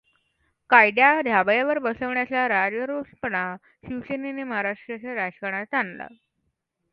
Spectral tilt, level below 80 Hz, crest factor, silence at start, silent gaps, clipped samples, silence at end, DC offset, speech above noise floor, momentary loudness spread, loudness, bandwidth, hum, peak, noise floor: -8 dB/octave; -64 dBFS; 24 dB; 0.7 s; none; under 0.1%; 0.85 s; under 0.1%; 52 dB; 16 LU; -23 LUFS; 5.6 kHz; none; 0 dBFS; -76 dBFS